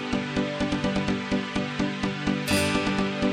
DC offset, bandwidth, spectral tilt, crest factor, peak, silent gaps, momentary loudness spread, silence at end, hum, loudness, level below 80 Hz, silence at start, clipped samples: under 0.1%; 15 kHz; -5 dB/octave; 14 dB; -12 dBFS; none; 4 LU; 0 s; none; -26 LUFS; -46 dBFS; 0 s; under 0.1%